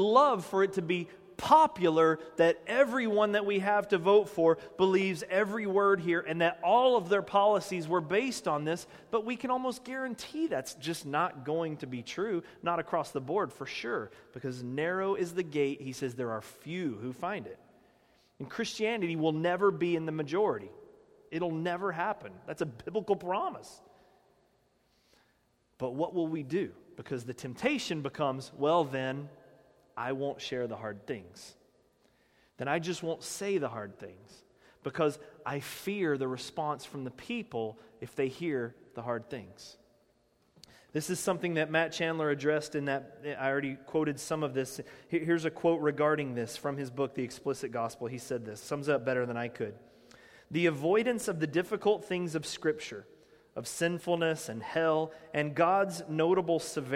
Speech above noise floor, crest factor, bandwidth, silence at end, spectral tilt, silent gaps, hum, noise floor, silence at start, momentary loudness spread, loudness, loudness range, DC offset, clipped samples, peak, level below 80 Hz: 40 dB; 22 dB; 16 kHz; 0 s; -5 dB/octave; none; none; -72 dBFS; 0 s; 14 LU; -32 LUFS; 10 LU; under 0.1%; under 0.1%; -10 dBFS; -72 dBFS